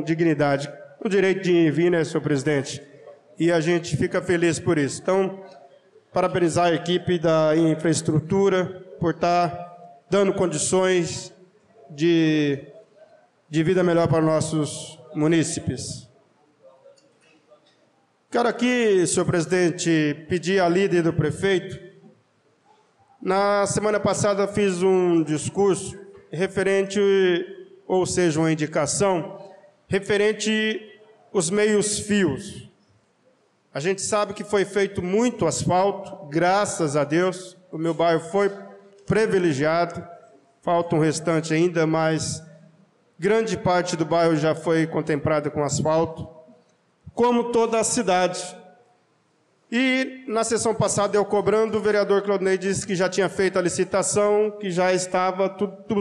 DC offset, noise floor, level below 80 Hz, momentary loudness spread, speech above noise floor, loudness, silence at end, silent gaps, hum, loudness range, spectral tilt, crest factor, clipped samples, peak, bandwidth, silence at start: under 0.1%; -64 dBFS; -56 dBFS; 10 LU; 43 dB; -22 LUFS; 0 s; none; none; 3 LU; -5 dB/octave; 10 dB; under 0.1%; -12 dBFS; 12 kHz; 0 s